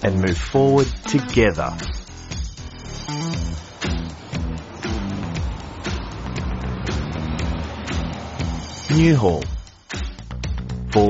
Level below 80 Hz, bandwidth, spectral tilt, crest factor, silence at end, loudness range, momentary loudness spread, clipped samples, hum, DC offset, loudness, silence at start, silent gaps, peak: -32 dBFS; 8 kHz; -6 dB/octave; 20 dB; 0 s; 6 LU; 14 LU; under 0.1%; none; under 0.1%; -23 LUFS; 0 s; none; -2 dBFS